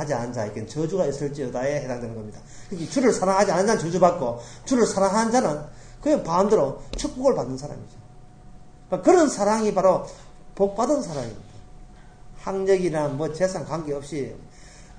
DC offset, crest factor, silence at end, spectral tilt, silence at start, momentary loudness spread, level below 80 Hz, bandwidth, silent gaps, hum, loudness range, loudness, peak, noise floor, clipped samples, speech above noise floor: under 0.1%; 20 dB; 0 s; -5.5 dB/octave; 0 s; 15 LU; -46 dBFS; 9.8 kHz; none; none; 5 LU; -23 LUFS; -4 dBFS; -45 dBFS; under 0.1%; 22 dB